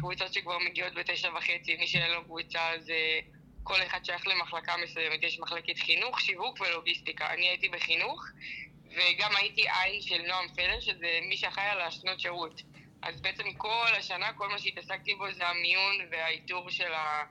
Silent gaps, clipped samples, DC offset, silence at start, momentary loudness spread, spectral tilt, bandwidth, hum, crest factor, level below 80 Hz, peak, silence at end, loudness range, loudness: none; under 0.1%; under 0.1%; 0 s; 8 LU; -2.5 dB/octave; 11.5 kHz; none; 20 dB; -60 dBFS; -12 dBFS; 0 s; 3 LU; -30 LUFS